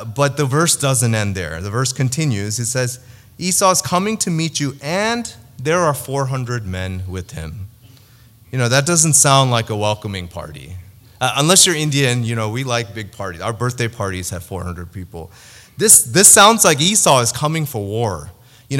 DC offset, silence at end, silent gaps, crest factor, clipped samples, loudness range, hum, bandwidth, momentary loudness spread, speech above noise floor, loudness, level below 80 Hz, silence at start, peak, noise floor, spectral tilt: under 0.1%; 0 s; none; 18 dB; under 0.1%; 11 LU; none; over 20 kHz; 19 LU; 30 dB; -15 LUFS; -48 dBFS; 0 s; 0 dBFS; -47 dBFS; -3 dB/octave